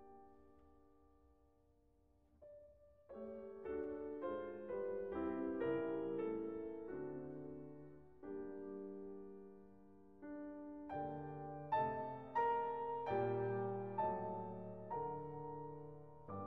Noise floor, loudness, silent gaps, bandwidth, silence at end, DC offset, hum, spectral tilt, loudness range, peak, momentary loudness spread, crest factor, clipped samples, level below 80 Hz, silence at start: -74 dBFS; -45 LUFS; none; 5.8 kHz; 0 s; under 0.1%; none; -7 dB/octave; 11 LU; -28 dBFS; 18 LU; 18 dB; under 0.1%; -72 dBFS; 0 s